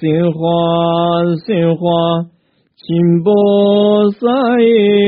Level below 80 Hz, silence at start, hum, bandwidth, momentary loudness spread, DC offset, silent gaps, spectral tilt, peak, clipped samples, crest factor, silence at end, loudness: -54 dBFS; 0 s; none; 4.7 kHz; 5 LU; under 0.1%; none; -6 dB/octave; -2 dBFS; under 0.1%; 10 dB; 0 s; -12 LUFS